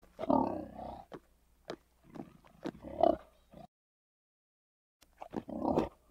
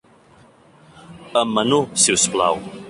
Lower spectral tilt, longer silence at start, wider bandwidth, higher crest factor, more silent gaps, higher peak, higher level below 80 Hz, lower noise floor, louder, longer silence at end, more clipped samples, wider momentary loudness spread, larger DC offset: first, -8 dB/octave vs -2.5 dB/octave; second, 0.2 s vs 0.95 s; first, 15.5 kHz vs 11.5 kHz; first, 26 dB vs 20 dB; first, 3.68-5.00 s vs none; second, -12 dBFS vs -2 dBFS; about the same, -60 dBFS vs -56 dBFS; first, -68 dBFS vs -50 dBFS; second, -35 LUFS vs -17 LUFS; first, 0.2 s vs 0 s; neither; first, 24 LU vs 7 LU; neither